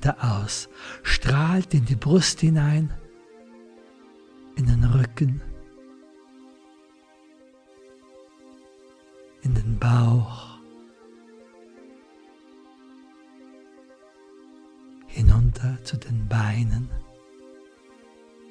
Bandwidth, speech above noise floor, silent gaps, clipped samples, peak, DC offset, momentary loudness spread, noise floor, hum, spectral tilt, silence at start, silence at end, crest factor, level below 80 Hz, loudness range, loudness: 10.5 kHz; 34 dB; none; under 0.1%; -4 dBFS; under 0.1%; 17 LU; -55 dBFS; none; -6 dB/octave; 0 s; 1.5 s; 22 dB; -34 dBFS; 9 LU; -23 LUFS